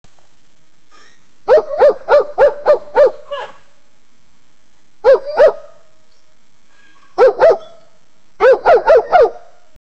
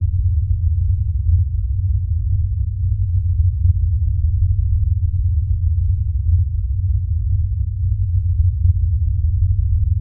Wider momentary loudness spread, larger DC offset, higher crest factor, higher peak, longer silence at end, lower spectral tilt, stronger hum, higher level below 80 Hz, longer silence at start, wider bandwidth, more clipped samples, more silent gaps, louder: first, 18 LU vs 3 LU; first, 2% vs under 0.1%; about the same, 14 dB vs 12 dB; first, 0 dBFS vs -4 dBFS; first, 0.65 s vs 0 s; second, -4.5 dB/octave vs -29 dB/octave; neither; second, -48 dBFS vs -20 dBFS; first, 1.45 s vs 0 s; first, 7.8 kHz vs 0.3 kHz; neither; neither; first, -12 LUFS vs -19 LUFS